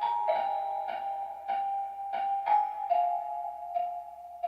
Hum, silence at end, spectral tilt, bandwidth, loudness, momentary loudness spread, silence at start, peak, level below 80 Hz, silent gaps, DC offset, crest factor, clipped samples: none; 0 s; -3.5 dB/octave; 5.6 kHz; -32 LUFS; 9 LU; 0 s; -16 dBFS; -76 dBFS; none; under 0.1%; 16 dB; under 0.1%